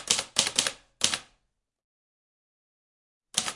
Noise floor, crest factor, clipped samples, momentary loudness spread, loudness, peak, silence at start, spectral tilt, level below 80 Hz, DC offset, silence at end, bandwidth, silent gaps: -76 dBFS; 32 dB; under 0.1%; 8 LU; -27 LUFS; 0 dBFS; 0 s; 0.5 dB/octave; -68 dBFS; under 0.1%; 0 s; 11.5 kHz; 1.84-3.21 s